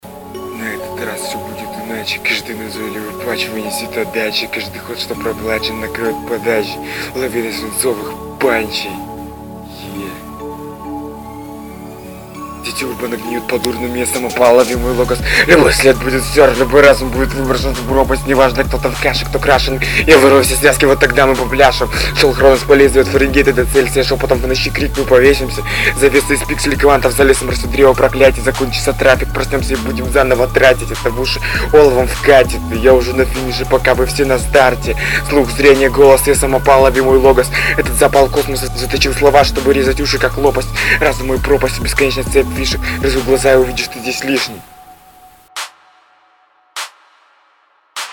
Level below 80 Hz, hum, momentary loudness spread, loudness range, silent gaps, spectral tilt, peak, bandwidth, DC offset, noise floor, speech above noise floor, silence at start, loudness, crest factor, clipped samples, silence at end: -24 dBFS; none; 17 LU; 11 LU; none; -4 dB/octave; 0 dBFS; over 20 kHz; 0.2%; -54 dBFS; 42 dB; 0.05 s; -12 LUFS; 12 dB; 0.2%; 0 s